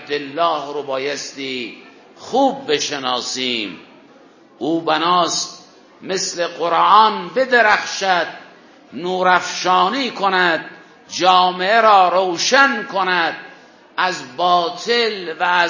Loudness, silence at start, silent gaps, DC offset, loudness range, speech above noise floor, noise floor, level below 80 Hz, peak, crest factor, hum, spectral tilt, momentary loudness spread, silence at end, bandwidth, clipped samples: -17 LUFS; 0 s; none; under 0.1%; 6 LU; 30 dB; -47 dBFS; -70 dBFS; 0 dBFS; 18 dB; none; -2.5 dB/octave; 13 LU; 0 s; 7.4 kHz; under 0.1%